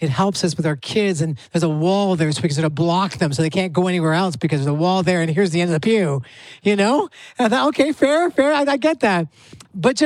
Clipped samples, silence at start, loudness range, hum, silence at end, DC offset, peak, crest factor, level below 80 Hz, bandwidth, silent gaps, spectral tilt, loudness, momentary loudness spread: under 0.1%; 0 s; 1 LU; none; 0 s; under 0.1%; -2 dBFS; 16 dB; -58 dBFS; 12.5 kHz; none; -6 dB/octave; -19 LUFS; 6 LU